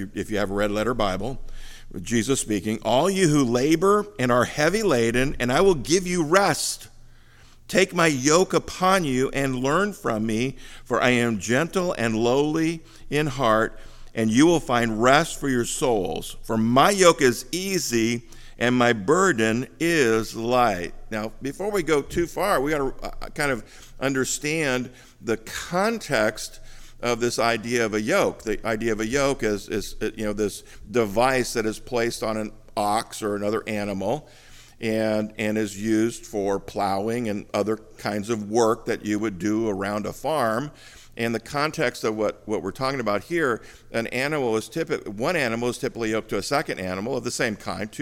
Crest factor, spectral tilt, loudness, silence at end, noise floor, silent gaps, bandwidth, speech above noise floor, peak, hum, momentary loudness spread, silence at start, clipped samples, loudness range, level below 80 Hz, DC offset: 24 dB; -4.5 dB/octave; -23 LUFS; 0 s; -49 dBFS; none; 17 kHz; 26 dB; 0 dBFS; none; 10 LU; 0 s; under 0.1%; 5 LU; -44 dBFS; under 0.1%